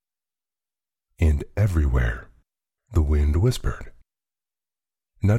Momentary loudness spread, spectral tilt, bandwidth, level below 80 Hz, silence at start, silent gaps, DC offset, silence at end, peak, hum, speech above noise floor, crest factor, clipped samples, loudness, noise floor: 10 LU; -7.5 dB/octave; 12.5 kHz; -28 dBFS; 1.2 s; none; under 0.1%; 0 s; -10 dBFS; none; over 69 dB; 16 dB; under 0.1%; -24 LUFS; under -90 dBFS